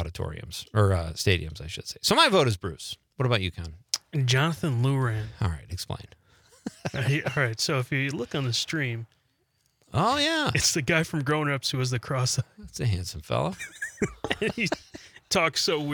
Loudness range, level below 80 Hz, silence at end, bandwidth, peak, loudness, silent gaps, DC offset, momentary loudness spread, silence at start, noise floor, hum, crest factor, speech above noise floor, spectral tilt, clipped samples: 4 LU; -52 dBFS; 0 s; 19.5 kHz; -6 dBFS; -26 LUFS; none; under 0.1%; 13 LU; 0 s; -71 dBFS; none; 22 dB; 44 dB; -4 dB/octave; under 0.1%